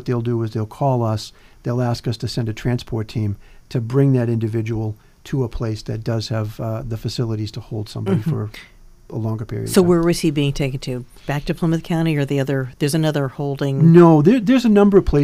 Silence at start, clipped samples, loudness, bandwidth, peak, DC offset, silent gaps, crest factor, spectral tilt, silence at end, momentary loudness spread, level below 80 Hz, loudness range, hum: 0 s; under 0.1%; -19 LUFS; 15.5 kHz; 0 dBFS; under 0.1%; none; 18 dB; -7 dB/octave; 0 s; 14 LU; -38 dBFS; 9 LU; none